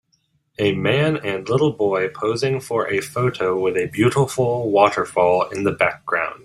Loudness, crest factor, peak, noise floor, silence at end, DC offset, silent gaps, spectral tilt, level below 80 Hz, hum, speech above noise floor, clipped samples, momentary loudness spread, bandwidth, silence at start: -20 LUFS; 18 dB; -2 dBFS; -66 dBFS; 0.1 s; under 0.1%; none; -6 dB/octave; -56 dBFS; none; 47 dB; under 0.1%; 5 LU; 15 kHz; 0.6 s